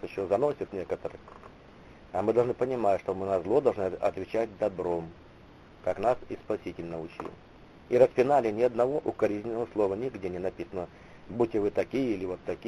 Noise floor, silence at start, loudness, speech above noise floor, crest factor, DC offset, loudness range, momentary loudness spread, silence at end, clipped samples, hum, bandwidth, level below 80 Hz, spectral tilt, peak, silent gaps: -52 dBFS; 0 s; -29 LUFS; 24 dB; 22 dB; under 0.1%; 5 LU; 13 LU; 0 s; under 0.1%; none; 11 kHz; -58 dBFS; -7.5 dB/octave; -8 dBFS; none